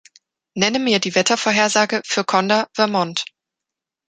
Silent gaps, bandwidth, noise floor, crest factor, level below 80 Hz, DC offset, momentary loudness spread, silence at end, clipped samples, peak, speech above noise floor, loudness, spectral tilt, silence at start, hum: none; 9.6 kHz; -85 dBFS; 20 dB; -66 dBFS; under 0.1%; 8 LU; 0.85 s; under 0.1%; 0 dBFS; 67 dB; -18 LUFS; -3 dB/octave; 0.55 s; none